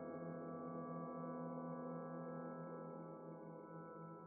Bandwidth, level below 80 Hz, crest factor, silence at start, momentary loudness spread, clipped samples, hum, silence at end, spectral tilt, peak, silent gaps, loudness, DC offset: 2.4 kHz; under -90 dBFS; 12 dB; 0 s; 6 LU; under 0.1%; none; 0 s; -6 dB/octave; -38 dBFS; none; -51 LUFS; under 0.1%